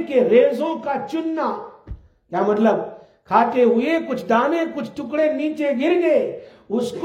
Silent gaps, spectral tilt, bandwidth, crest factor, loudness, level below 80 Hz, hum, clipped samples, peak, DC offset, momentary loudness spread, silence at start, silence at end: none; -6.5 dB/octave; 11 kHz; 18 dB; -20 LUFS; -50 dBFS; none; under 0.1%; -2 dBFS; under 0.1%; 13 LU; 0 s; 0 s